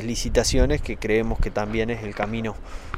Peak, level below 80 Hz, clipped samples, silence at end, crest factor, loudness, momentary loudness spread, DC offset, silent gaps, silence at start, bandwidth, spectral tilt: -6 dBFS; -28 dBFS; under 0.1%; 0 s; 18 dB; -24 LUFS; 8 LU; under 0.1%; none; 0 s; 15.5 kHz; -4.5 dB/octave